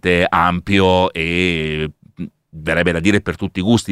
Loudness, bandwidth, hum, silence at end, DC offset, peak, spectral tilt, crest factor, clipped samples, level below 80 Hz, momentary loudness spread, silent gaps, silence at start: -16 LUFS; 14 kHz; none; 0 s; under 0.1%; 0 dBFS; -5.5 dB/octave; 16 dB; under 0.1%; -38 dBFS; 16 LU; none; 0.05 s